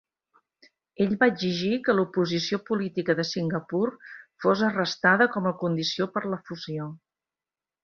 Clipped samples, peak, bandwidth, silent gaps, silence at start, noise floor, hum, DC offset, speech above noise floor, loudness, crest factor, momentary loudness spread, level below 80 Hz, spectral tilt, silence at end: under 0.1%; -6 dBFS; 7.2 kHz; none; 1 s; under -90 dBFS; none; under 0.1%; over 65 dB; -26 LUFS; 20 dB; 12 LU; -68 dBFS; -5.5 dB/octave; 0.85 s